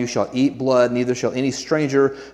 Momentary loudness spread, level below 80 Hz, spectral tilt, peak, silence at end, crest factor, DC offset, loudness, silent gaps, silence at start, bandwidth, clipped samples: 5 LU; -58 dBFS; -5.5 dB/octave; -4 dBFS; 0 s; 16 dB; under 0.1%; -20 LUFS; none; 0 s; 11.5 kHz; under 0.1%